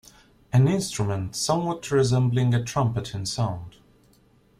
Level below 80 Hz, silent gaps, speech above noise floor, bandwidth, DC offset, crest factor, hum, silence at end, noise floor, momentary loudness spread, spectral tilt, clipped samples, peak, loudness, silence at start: -52 dBFS; none; 36 dB; 14 kHz; under 0.1%; 16 dB; none; 0.9 s; -59 dBFS; 8 LU; -6 dB/octave; under 0.1%; -8 dBFS; -24 LUFS; 0.55 s